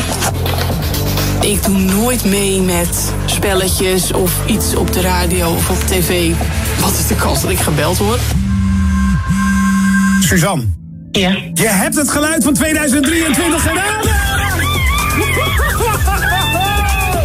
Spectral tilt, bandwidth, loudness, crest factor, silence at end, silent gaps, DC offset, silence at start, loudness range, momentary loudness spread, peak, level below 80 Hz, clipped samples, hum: -4 dB/octave; 16.5 kHz; -13 LUFS; 12 dB; 0 s; none; under 0.1%; 0 s; 1 LU; 3 LU; -2 dBFS; -22 dBFS; under 0.1%; none